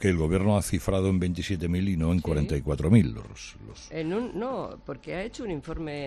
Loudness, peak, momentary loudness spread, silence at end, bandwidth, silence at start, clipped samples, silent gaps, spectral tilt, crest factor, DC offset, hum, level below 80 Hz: -27 LUFS; -8 dBFS; 17 LU; 0 s; 13.5 kHz; 0 s; under 0.1%; none; -7 dB/octave; 20 dB; under 0.1%; none; -42 dBFS